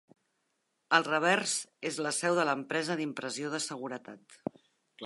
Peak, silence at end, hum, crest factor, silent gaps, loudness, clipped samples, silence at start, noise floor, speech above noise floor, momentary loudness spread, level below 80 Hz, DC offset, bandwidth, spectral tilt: -8 dBFS; 0 s; none; 24 dB; none; -31 LUFS; under 0.1%; 0.9 s; -79 dBFS; 48 dB; 16 LU; -82 dBFS; under 0.1%; 11.5 kHz; -3 dB/octave